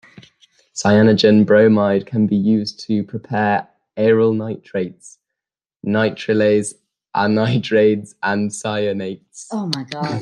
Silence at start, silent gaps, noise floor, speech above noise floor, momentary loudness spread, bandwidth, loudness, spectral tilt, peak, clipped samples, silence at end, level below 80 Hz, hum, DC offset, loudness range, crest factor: 0.75 s; none; -87 dBFS; 70 dB; 14 LU; 10.5 kHz; -17 LUFS; -6 dB/octave; -2 dBFS; under 0.1%; 0 s; -60 dBFS; none; under 0.1%; 5 LU; 16 dB